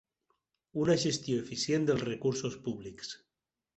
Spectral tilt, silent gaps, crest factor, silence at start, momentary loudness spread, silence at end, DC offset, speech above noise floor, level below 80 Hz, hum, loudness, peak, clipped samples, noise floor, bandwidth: -5 dB/octave; none; 18 dB; 0.75 s; 14 LU; 0.6 s; under 0.1%; 48 dB; -66 dBFS; none; -32 LUFS; -16 dBFS; under 0.1%; -80 dBFS; 8.4 kHz